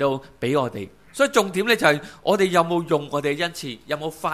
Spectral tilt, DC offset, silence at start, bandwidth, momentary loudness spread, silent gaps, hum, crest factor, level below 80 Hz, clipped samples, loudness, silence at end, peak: -4.5 dB/octave; 0.2%; 0 s; 15.5 kHz; 11 LU; none; none; 20 dB; -58 dBFS; under 0.1%; -22 LUFS; 0 s; -2 dBFS